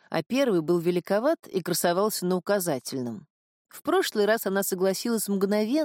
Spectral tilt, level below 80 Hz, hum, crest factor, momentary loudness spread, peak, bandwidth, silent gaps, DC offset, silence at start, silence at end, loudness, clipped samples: -4.5 dB/octave; -76 dBFS; none; 14 dB; 7 LU; -12 dBFS; 17 kHz; 3.30-3.65 s; under 0.1%; 0.1 s; 0 s; -26 LUFS; under 0.1%